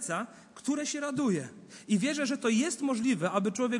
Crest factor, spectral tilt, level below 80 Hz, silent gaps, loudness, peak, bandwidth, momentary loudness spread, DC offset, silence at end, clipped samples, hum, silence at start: 16 dB; -4.5 dB/octave; -76 dBFS; none; -30 LUFS; -14 dBFS; 11.5 kHz; 10 LU; under 0.1%; 0 s; under 0.1%; none; 0 s